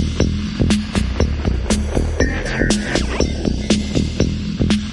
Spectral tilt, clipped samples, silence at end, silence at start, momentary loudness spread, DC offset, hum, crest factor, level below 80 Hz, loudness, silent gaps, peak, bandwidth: -5.5 dB/octave; under 0.1%; 0 s; 0 s; 3 LU; under 0.1%; none; 16 dB; -24 dBFS; -19 LUFS; none; -2 dBFS; 11.5 kHz